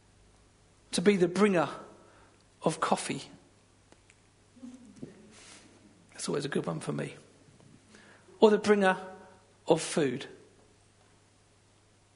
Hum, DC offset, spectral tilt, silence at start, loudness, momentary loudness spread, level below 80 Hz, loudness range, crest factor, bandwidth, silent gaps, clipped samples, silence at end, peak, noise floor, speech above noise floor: none; under 0.1%; -5 dB/octave; 0.9 s; -29 LUFS; 26 LU; -70 dBFS; 10 LU; 26 dB; 11 kHz; none; under 0.1%; 1.8 s; -6 dBFS; -64 dBFS; 36 dB